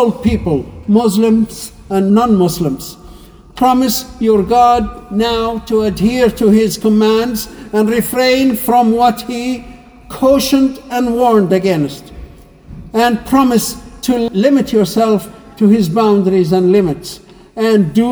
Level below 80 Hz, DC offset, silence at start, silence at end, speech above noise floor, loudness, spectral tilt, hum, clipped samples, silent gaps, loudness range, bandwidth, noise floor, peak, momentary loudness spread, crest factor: -36 dBFS; under 0.1%; 0 s; 0 s; 25 dB; -13 LUFS; -6 dB/octave; none; under 0.1%; none; 2 LU; over 20 kHz; -37 dBFS; 0 dBFS; 10 LU; 12 dB